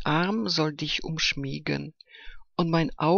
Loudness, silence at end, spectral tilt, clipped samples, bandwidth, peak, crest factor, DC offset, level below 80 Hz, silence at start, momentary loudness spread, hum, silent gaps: -27 LUFS; 0 s; -5 dB/octave; under 0.1%; 7.2 kHz; -10 dBFS; 16 dB; under 0.1%; -48 dBFS; 0 s; 9 LU; none; none